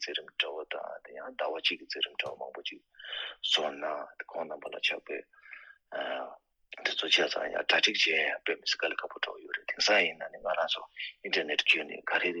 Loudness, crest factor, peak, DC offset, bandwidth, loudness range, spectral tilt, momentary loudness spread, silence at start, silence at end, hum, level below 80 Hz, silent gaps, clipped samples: -30 LUFS; 22 dB; -10 dBFS; under 0.1%; 11 kHz; 7 LU; -0.5 dB/octave; 16 LU; 0 s; 0 s; none; -76 dBFS; none; under 0.1%